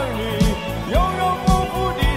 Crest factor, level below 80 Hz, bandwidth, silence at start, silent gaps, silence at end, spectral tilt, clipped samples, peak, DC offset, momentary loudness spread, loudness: 14 dB; -24 dBFS; 16 kHz; 0 s; none; 0 s; -5.5 dB/octave; under 0.1%; -6 dBFS; under 0.1%; 4 LU; -20 LUFS